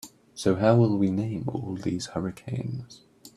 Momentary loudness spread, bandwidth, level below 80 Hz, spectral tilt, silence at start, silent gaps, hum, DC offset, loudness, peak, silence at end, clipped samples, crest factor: 13 LU; 14.5 kHz; -58 dBFS; -7 dB/octave; 0.05 s; none; none; under 0.1%; -26 LUFS; -6 dBFS; 0.1 s; under 0.1%; 22 dB